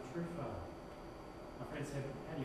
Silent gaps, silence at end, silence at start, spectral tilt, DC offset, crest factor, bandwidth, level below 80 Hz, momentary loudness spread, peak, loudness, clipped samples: none; 0 s; 0 s; -6.5 dB/octave; under 0.1%; 14 dB; 13.5 kHz; -60 dBFS; 8 LU; -30 dBFS; -47 LUFS; under 0.1%